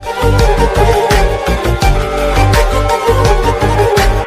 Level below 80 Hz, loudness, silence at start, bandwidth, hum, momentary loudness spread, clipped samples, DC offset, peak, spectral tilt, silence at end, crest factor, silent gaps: -14 dBFS; -12 LUFS; 0 s; 15.5 kHz; none; 3 LU; under 0.1%; under 0.1%; 0 dBFS; -5.5 dB/octave; 0 s; 10 dB; none